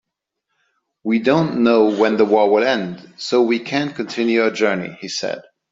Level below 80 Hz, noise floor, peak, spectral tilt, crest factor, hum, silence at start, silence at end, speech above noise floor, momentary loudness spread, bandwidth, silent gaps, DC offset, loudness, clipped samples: -62 dBFS; -77 dBFS; -2 dBFS; -5.5 dB/octave; 16 dB; none; 1.05 s; 0.3 s; 60 dB; 12 LU; 7.8 kHz; none; under 0.1%; -18 LUFS; under 0.1%